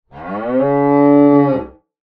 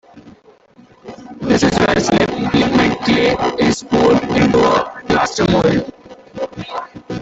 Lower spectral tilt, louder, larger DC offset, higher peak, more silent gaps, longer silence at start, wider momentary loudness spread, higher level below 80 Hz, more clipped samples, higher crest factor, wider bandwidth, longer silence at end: first, -11.5 dB/octave vs -5.5 dB/octave; about the same, -13 LUFS vs -15 LUFS; neither; about the same, 0 dBFS vs -2 dBFS; neither; about the same, 0.15 s vs 0.15 s; about the same, 13 LU vs 14 LU; second, -50 dBFS vs -40 dBFS; neither; about the same, 14 dB vs 14 dB; second, 4.1 kHz vs 8.2 kHz; first, 0.4 s vs 0 s